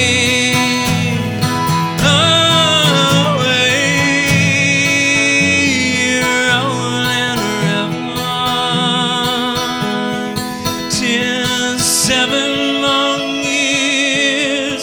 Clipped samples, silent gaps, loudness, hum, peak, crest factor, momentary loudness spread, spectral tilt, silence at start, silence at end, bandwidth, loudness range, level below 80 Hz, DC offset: under 0.1%; none; -13 LUFS; none; 0 dBFS; 14 dB; 7 LU; -3 dB/octave; 0 s; 0 s; over 20 kHz; 5 LU; -44 dBFS; under 0.1%